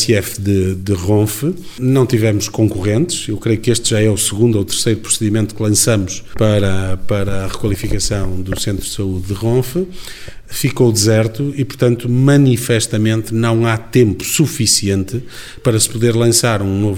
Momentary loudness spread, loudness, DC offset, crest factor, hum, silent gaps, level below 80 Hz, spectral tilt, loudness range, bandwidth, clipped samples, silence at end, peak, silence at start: 9 LU; -15 LUFS; under 0.1%; 14 dB; none; none; -34 dBFS; -5 dB/octave; 5 LU; 17.5 kHz; under 0.1%; 0 s; 0 dBFS; 0 s